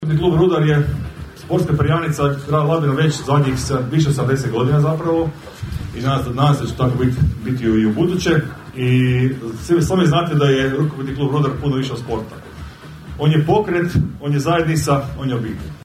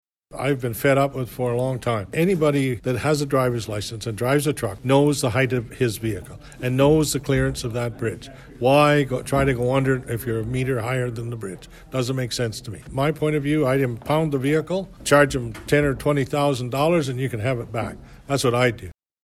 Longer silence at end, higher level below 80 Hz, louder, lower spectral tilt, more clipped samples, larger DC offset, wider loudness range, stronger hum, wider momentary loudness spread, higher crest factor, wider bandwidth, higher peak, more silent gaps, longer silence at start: second, 0.05 s vs 0.35 s; first, -36 dBFS vs -44 dBFS; first, -18 LUFS vs -22 LUFS; about the same, -7 dB/octave vs -6 dB/octave; neither; neither; about the same, 3 LU vs 3 LU; neither; about the same, 12 LU vs 11 LU; second, 14 dB vs 20 dB; about the same, 14.5 kHz vs 15 kHz; about the same, -2 dBFS vs -2 dBFS; neither; second, 0 s vs 0.3 s